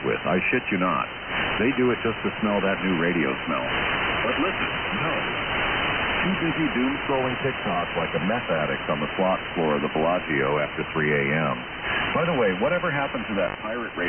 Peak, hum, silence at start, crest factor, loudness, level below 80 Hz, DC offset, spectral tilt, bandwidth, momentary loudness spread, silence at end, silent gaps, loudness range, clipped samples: -12 dBFS; none; 0 s; 12 dB; -24 LUFS; -46 dBFS; under 0.1%; -2 dB/octave; 3.4 kHz; 4 LU; 0 s; none; 1 LU; under 0.1%